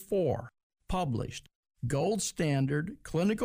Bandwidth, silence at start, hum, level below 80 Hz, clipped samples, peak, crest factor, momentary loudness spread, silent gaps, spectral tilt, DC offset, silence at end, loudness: 15.5 kHz; 0 s; none; -50 dBFS; under 0.1%; -18 dBFS; 14 dB; 11 LU; 0.63-0.70 s, 1.55-1.63 s; -5.5 dB/octave; under 0.1%; 0 s; -32 LUFS